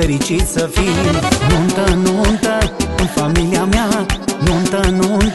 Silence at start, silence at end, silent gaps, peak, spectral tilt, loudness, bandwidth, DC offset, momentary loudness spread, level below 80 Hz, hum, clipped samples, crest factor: 0 s; 0 s; none; 0 dBFS; -5 dB/octave; -15 LUFS; 12.5 kHz; 0.6%; 3 LU; -22 dBFS; none; under 0.1%; 14 dB